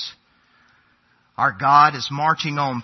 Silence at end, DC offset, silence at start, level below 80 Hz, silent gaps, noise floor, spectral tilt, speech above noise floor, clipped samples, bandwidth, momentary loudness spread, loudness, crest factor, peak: 0 s; under 0.1%; 0 s; -66 dBFS; none; -61 dBFS; -4.5 dB/octave; 43 dB; under 0.1%; 6.4 kHz; 14 LU; -18 LUFS; 20 dB; 0 dBFS